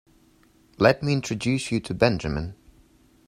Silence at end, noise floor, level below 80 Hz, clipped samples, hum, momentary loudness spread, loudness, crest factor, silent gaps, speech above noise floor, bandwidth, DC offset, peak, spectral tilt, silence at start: 0.75 s; -59 dBFS; -46 dBFS; under 0.1%; none; 10 LU; -24 LUFS; 24 dB; none; 35 dB; 14 kHz; under 0.1%; -2 dBFS; -6 dB/octave; 0.8 s